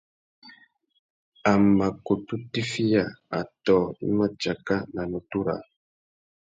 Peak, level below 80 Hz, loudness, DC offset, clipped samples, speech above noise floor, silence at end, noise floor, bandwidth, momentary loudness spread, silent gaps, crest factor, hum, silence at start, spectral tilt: -8 dBFS; -56 dBFS; -25 LUFS; under 0.1%; under 0.1%; 31 dB; 0.9 s; -56 dBFS; 9 kHz; 11 LU; 0.99-1.32 s; 18 dB; none; 0.45 s; -6.5 dB/octave